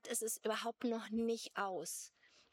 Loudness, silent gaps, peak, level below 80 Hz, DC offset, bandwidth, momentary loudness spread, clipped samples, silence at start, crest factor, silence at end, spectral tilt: -41 LUFS; none; -24 dBFS; -82 dBFS; under 0.1%; 17.5 kHz; 6 LU; under 0.1%; 0.05 s; 16 dB; 0.45 s; -2.5 dB/octave